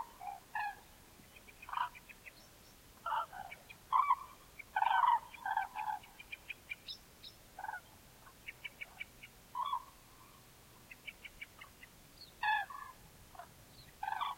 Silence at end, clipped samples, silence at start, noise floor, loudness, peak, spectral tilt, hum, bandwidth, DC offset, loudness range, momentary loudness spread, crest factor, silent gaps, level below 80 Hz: 0 s; under 0.1%; 0 s; -60 dBFS; -39 LUFS; -18 dBFS; -1.5 dB/octave; none; 16.5 kHz; under 0.1%; 11 LU; 24 LU; 24 dB; none; -68 dBFS